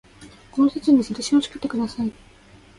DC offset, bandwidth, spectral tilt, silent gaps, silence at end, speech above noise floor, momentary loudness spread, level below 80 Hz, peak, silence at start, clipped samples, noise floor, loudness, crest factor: under 0.1%; 11.5 kHz; -5 dB/octave; none; 0.65 s; 26 dB; 11 LU; -54 dBFS; -6 dBFS; 0.2 s; under 0.1%; -46 dBFS; -22 LUFS; 16 dB